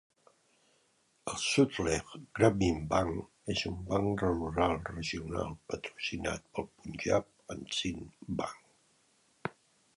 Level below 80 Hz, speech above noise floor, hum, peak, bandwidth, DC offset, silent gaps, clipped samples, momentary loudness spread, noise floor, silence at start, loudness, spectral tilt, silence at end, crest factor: -52 dBFS; 39 dB; none; -12 dBFS; 11.5 kHz; under 0.1%; none; under 0.1%; 15 LU; -72 dBFS; 1.25 s; -33 LUFS; -5 dB/octave; 0.45 s; 24 dB